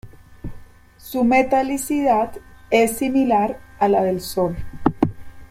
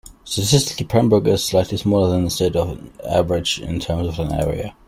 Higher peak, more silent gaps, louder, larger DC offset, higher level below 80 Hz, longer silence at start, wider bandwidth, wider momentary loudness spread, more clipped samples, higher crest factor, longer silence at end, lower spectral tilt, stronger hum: about the same, -2 dBFS vs -2 dBFS; neither; about the same, -20 LUFS vs -19 LUFS; neither; about the same, -42 dBFS vs -38 dBFS; about the same, 0.05 s vs 0.05 s; about the same, 16.5 kHz vs 16 kHz; first, 11 LU vs 8 LU; neither; about the same, 18 dB vs 16 dB; about the same, 0.05 s vs 0.15 s; about the same, -5.5 dB/octave vs -5 dB/octave; neither